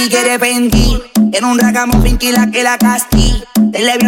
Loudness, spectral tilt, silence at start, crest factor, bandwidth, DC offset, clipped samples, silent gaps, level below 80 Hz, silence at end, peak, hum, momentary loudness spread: -11 LUFS; -4 dB/octave; 0 s; 10 dB; 17.5 kHz; under 0.1%; under 0.1%; none; -18 dBFS; 0 s; 0 dBFS; none; 2 LU